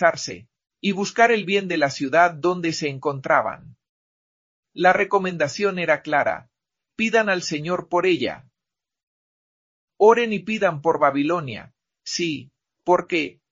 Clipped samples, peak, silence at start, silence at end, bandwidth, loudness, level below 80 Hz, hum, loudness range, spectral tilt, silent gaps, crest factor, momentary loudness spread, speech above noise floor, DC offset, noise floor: under 0.1%; -2 dBFS; 0 s; 0.2 s; 7.6 kHz; -21 LUFS; -64 dBFS; none; 2 LU; -4.5 dB/octave; 3.89-4.63 s, 9.03-9.88 s; 20 dB; 14 LU; 66 dB; under 0.1%; -87 dBFS